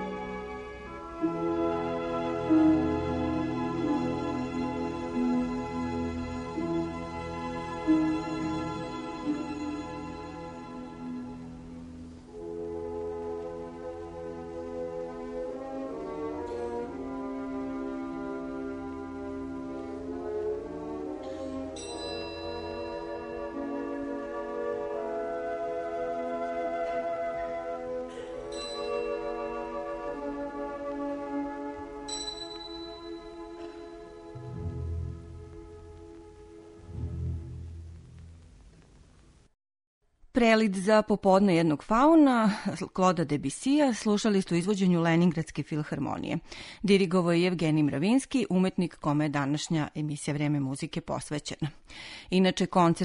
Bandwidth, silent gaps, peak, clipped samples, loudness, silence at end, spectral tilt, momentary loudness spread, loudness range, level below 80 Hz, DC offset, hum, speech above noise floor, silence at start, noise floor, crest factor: 10.5 kHz; 39.87-40.01 s; -8 dBFS; under 0.1%; -30 LUFS; 0 s; -6 dB/octave; 17 LU; 15 LU; -52 dBFS; under 0.1%; none; 32 dB; 0 s; -58 dBFS; 22 dB